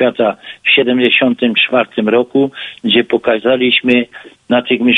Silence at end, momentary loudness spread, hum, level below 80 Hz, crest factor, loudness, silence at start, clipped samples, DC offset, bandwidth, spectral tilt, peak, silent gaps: 0 s; 7 LU; none; -56 dBFS; 12 dB; -12 LUFS; 0 s; under 0.1%; under 0.1%; 4.3 kHz; -6.5 dB/octave; 0 dBFS; none